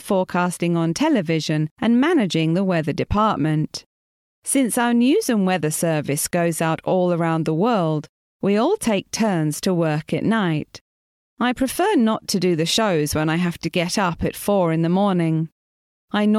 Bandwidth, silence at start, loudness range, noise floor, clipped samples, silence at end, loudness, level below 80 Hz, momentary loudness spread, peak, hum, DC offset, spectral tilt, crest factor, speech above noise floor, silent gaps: 15.5 kHz; 0 s; 2 LU; under -90 dBFS; under 0.1%; 0 s; -20 LUFS; -48 dBFS; 5 LU; -6 dBFS; none; under 0.1%; -5.5 dB/octave; 14 dB; over 70 dB; 1.71-1.76 s, 3.86-4.42 s, 8.09-8.40 s, 10.81-11.37 s, 15.52-16.08 s